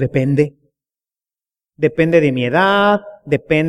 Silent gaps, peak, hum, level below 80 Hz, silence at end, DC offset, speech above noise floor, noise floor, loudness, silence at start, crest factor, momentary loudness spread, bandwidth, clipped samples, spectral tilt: none; -2 dBFS; none; -50 dBFS; 0 s; under 0.1%; over 76 dB; under -90 dBFS; -15 LUFS; 0 s; 16 dB; 8 LU; 11.5 kHz; under 0.1%; -7.5 dB/octave